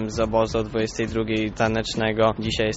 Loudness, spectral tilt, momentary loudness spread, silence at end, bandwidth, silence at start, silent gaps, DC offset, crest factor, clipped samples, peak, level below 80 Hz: -23 LUFS; -4.5 dB/octave; 4 LU; 0 s; 8 kHz; 0 s; none; under 0.1%; 16 dB; under 0.1%; -6 dBFS; -40 dBFS